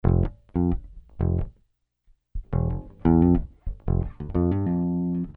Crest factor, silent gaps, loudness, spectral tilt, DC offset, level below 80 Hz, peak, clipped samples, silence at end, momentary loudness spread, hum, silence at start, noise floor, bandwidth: 16 dB; none; -25 LUFS; -13 dB/octave; under 0.1%; -32 dBFS; -8 dBFS; under 0.1%; 0.05 s; 15 LU; none; 0.05 s; -67 dBFS; 3.2 kHz